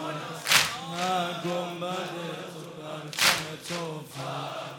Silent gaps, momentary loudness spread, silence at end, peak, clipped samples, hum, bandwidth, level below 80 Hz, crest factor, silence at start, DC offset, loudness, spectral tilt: none; 16 LU; 0 s; -6 dBFS; under 0.1%; none; 19 kHz; -70 dBFS; 24 dB; 0 s; under 0.1%; -28 LUFS; -2 dB/octave